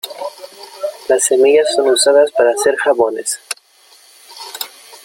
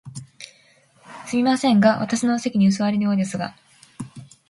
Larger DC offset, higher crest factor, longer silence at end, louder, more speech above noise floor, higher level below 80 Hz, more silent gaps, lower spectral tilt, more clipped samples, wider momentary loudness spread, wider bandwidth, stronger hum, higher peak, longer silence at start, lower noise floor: neither; about the same, 14 dB vs 18 dB; second, 0.1 s vs 0.25 s; first, -13 LUFS vs -20 LUFS; about the same, 35 dB vs 37 dB; about the same, -62 dBFS vs -64 dBFS; neither; second, -0.5 dB/octave vs -5.5 dB/octave; neither; second, 18 LU vs 22 LU; first, 17 kHz vs 11.5 kHz; neither; first, 0 dBFS vs -4 dBFS; about the same, 0.05 s vs 0.05 s; second, -48 dBFS vs -56 dBFS